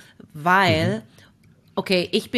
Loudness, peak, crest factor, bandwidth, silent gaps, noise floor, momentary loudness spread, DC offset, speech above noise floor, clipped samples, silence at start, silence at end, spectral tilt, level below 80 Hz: -21 LUFS; -4 dBFS; 18 dB; 14 kHz; none; -54 dBFS; 14 LU; under 0.1%; 33 dB; under 0.1%; 0.35 s; 0 s; -5.5 dB/octave; -56 dBFS